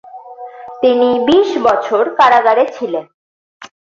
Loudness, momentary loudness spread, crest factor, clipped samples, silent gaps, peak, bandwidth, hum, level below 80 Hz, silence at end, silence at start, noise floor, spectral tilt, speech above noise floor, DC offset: -12 LUFS; 21 LU; 14 dB; under 0.1%; 3.14-3.60 s; 0 dBFS; 7.6 kHz; none; -56 dBFS; 0.3 s; 0.15 s; -32 dBFS; -4.5 dB/octave; 20 dB; under 0.1%